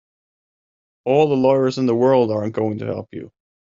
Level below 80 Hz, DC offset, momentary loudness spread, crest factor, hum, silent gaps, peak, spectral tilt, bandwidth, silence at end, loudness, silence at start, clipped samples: -62 dBFS; under 0.1%; 14 LU; 16 dB; none; none; -4 dBFS; -6.5 dB/octave; 7.6 kHz; 0.35 s; -18 LUFS; 1.05 s; under 0.1%